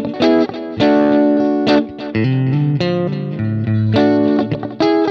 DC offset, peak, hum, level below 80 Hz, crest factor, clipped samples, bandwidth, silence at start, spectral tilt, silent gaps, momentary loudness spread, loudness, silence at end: under 0.1%; -2 dBFS; none; -50 dBFS; 14 dB; under 0.1%; 6.6 kHz; 0 s; -8.5 dB/octave; none; 8 LU; -15 LUFS; 0 s